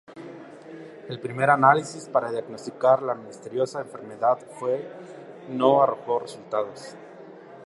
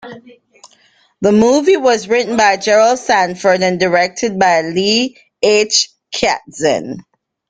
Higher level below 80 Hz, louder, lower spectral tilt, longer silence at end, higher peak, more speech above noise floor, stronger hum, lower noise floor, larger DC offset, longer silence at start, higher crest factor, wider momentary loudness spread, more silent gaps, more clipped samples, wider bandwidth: second, -76 dBFS vs -52 dBFS; second, -24 LUFS vs -13 LUFS; first, -5.5 dB/octave vs -3 dB/octave; second, 0 s vs 0.5 s; about the same, -2 dBFS vs 0 dBFS; second, 20 dB vs 40 dB; neither; second, -44 dBFS vs -53 dBFS; neither; about the same, 0.1 s vs 0.05 s; first, 24 dB vs 14 dB; first, 23 LU vs 7 LU; neither; neither; first, 11.5 kHz vs 9.6 kHz